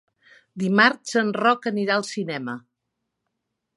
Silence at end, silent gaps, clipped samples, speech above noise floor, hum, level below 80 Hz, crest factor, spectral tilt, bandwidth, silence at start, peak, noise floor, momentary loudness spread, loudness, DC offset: 1.2 s; none; under 0.1%; 58 dB; none; -78 dBFS; 22 dB; -4.5 dB/octave; 11.5 kHz; 0.55 s; -2 dBFS; -80 dBFS; 15 LU; -22 LUFS; under 0.1%